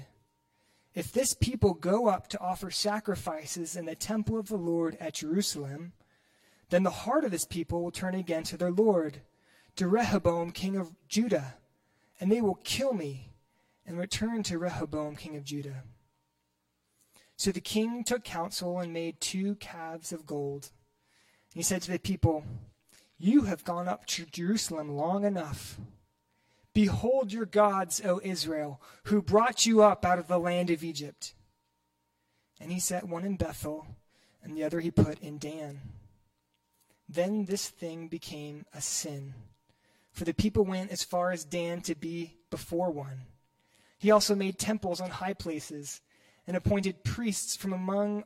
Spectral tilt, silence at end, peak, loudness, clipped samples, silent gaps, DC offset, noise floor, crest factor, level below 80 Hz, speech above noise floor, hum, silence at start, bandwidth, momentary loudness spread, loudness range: -4.5 dB/octave; 0 s; -10 dBFS; -31 LUFS; under 0.1%; none; under 0.1%; -78 dBFS; 22 dB; -56 dBFS; 48 dB; none; 0 s; 16 kHz; 15 LU; 9 LU